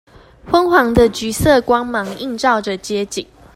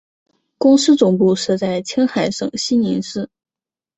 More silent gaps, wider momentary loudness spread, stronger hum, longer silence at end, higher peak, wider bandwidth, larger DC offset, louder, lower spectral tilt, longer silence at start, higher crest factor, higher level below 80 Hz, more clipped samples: neither; about the same, 10 LU vs 10 LU; neither; second, 0.3 s vs 0.7 s; about the same, 0 dBFS vs -2 dBFS; first, 16 kHz vs 8.2 kHz; neither; about the same, -16 LUFS vs -16 LUFS; about the same, -4.5 dB/octave vs -5 dB/octave; second, 0.45 s vs 0.6 s; about the same, 16 dB vs 16 dB; first, -36 dBFS vs -58 dBFS; neither